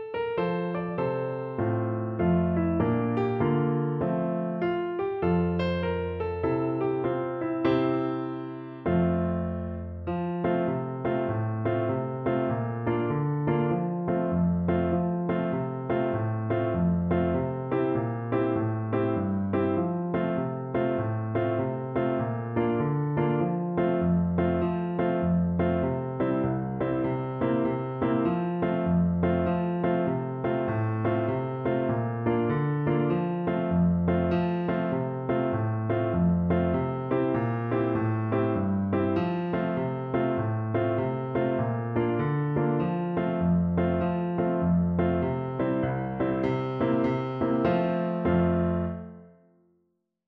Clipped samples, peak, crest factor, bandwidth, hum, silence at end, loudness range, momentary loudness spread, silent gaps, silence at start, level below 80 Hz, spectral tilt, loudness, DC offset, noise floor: under 0.1%; -10 dBFS; 16 dB; 4.7 kHz; none; 1 s; 2 LU; 4 LU; none; 0 s; -50 dBFS; -11 dB/octave; -27 LUFS; under 0.1%; -74 dBFS